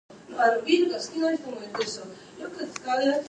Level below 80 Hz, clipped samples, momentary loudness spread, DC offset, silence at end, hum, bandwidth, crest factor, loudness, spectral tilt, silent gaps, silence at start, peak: -72 dBFS; under 0.1%; 16 LU; under 0.1%; 0.05 s; none; 9.6 kHz; 18 dB; -26 LUFS; -3 dB/octave; none; 0.1 s; -10 dBFS